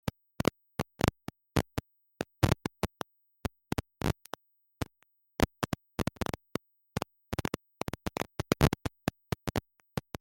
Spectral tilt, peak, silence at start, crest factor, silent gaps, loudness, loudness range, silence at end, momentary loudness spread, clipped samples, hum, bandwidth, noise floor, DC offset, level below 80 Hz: -5.5 dB/octave; -8 dBFS; 0.05 s; 26 dB; none; -35 LUFS; 3 LU; 0.2 s; 12 LU; under 0.1%; none; 16.5 kHz; -72 dBFS; under 0.1%; -48 dBFS